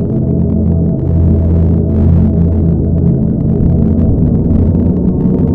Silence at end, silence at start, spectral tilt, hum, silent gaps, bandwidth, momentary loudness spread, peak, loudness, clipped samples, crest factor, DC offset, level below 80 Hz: 0 s; 0 s; -13.5 dB/octave; none; none; 2 kHz; 2 LU; 0 dBFS; -11 LUFS; under 0.1%; 10 dB; under 0.1%; -18 dBFS